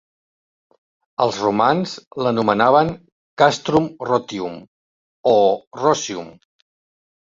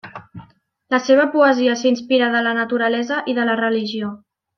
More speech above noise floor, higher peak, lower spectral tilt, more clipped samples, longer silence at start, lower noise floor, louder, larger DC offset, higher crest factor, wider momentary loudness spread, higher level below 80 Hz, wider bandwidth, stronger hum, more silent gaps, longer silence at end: first, over 72 dB vs 35 dB; about the same, 0 dBFS vs -2 dBFS; about the same, -5 dB/octave vs -4.5 dB/octave; neither; first, 1.2 s vs 0.05 s; first, under -90 dBFS vs -52 dBFS; about the same, -18 LUFS vs -18 LUFS; neither; about the same, 20 dB vs 16 dB; first, 15 LU vs 11 LU; first, -56 dBFS vs -66 dBFS; first, 7.8 kHz vs 6.6 kHz; neither; first, 2.07-2.11 s, 3.12-3.37 s, 4.68-5.24 s, 5.67-5.71 s vs none; first, 0.9 s vs 0.4 s